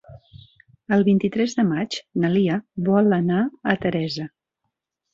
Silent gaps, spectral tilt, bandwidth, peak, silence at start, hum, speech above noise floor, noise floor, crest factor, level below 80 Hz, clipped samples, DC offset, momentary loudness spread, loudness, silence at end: none; -7 dB/octave; 7.6 kHz; -4 dBFS; 0.1 s; none; 59 dB; -79 dBFS; 18 dB; -58 dBFS; under 0.1%; under 0.1%; 8 LU; -21 LUFS; 0.85 s